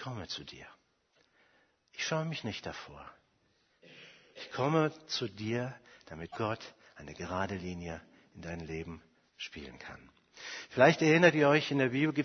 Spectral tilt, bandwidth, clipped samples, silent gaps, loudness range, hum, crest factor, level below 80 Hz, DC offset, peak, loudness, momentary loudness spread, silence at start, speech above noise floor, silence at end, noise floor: -5.5 dB/octave; 6.6 kHz; under 0.1%; none; 12 LU; none; 26 dB; -64 dBFS; under 0.1%; -8 dBFS; -31 LUFS; 26 LU; 0 s; 40 dB; 0 s; -73 dBFS